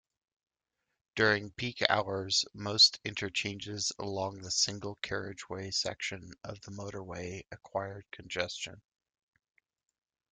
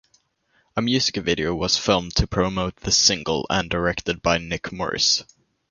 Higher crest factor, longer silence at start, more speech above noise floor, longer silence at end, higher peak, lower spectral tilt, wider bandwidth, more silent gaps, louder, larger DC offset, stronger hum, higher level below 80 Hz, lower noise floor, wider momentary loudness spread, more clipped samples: first, 30 dB vs 20 dB; first, 1.15 s vs 0.75 s; first, 52 dB vs 43 dB; first, 1.55 s vs 0.45 s; second, -6 dBFS vs -2 dBFS; about the same, -2 dB/octave vs -3 dB/octave; about the same, 11.5 kHz vs 11 kHz; neither; second, -31 LUFS vs -21 LUFS; neither; neither; second, -68 dBFS vs -38 dBFS; first, -86 dBFS vs -66 dBFS; first, 15 LU vs 9 LU; neither